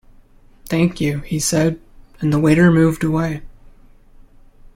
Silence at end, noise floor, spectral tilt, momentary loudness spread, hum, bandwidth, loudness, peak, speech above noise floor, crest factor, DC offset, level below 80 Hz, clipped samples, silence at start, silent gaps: 1.05 s; -47 dBFS; -6 dB/octave; 12 LU; none; 16.5 kHz; -17 LUFS; -2 dBFS; 31 dB; 16 dB; under 0.1%; -40 dBFS; under 0.1%; 0.65 s; none